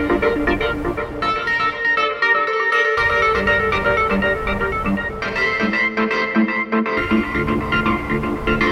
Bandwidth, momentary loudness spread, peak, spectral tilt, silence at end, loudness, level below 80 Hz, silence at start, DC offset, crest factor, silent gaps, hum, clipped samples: 14.5 kHz; 5 LU; -4 dBFS; -6 dB/octave; 0 s; -18 LUFS; -34 dBFS; 0 s; under 0.1%; 14 dB; none; none; under 0.1%